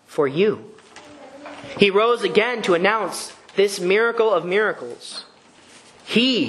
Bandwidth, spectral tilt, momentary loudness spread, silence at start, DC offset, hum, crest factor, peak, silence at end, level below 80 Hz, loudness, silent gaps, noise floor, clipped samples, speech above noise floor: 12.5 kHz; -4 dB/octave; 17 LU; 0.1 s; under 0.1%; none; 20 dB; 0 dBFS; 0 s; -66 dBFS; -19 LUFS; none; -49 dBFS; under 0.1%; 29 dB